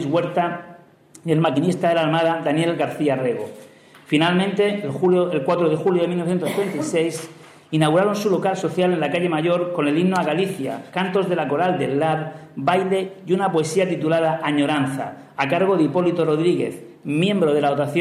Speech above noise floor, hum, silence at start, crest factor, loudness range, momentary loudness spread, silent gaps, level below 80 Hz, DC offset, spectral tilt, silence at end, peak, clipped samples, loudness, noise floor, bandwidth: 28 dB; none; 0 s; 16 dB; 1 LU; 7 LU; none; -68 dBFS; under 0.1%; -6 dB/octave; 0 s; -4 dBFS; under 0.1%; -20 LUFS; -48 dBFS; 15 kHz